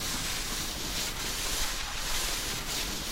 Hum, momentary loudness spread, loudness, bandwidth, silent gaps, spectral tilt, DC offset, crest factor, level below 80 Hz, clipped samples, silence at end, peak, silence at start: none; 2 LU; -31 LUFS; 16 kHz; none; -1 dB/octave; under 0.1%; 14 dB; -40 dBFS; under 0.1%; 0 s; -18 dBFS; 0 s